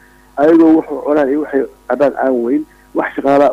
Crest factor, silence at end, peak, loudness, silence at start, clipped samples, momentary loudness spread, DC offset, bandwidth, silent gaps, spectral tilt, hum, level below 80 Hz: 10 dB; 0 s; -2 dBFS; -14 LUFS; 0.35 s; under 0.1%; 11 LU; under 0.1%; 6.6 kHz; none; -7.5 dB/octave; none; -50 dBFS